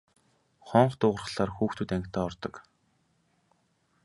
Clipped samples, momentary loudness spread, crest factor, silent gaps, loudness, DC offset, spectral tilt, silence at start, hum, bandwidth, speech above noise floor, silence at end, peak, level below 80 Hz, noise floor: under 0.1%; 10 LU; 26 dB; none; -28 LUFS; under 0.1%; -7 dB/octave; 0.65 s; none; 11.5 kHz; 43 dB; 1.45 s; -6 dBFS; -56 dBFS; -71 dBFS